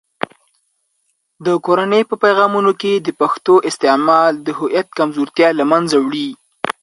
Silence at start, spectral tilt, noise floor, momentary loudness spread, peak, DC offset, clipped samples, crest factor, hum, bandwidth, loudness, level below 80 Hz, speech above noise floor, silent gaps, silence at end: 1.4 s; -5 dB/octave; -67 dBFS; 11 LU; 0 dBFS; under 0.1%; under 0.1%; 16 dB; none; 11.5 kHz; -15 LUFS; -66 dBFS; 53 dB; none; 0.1 s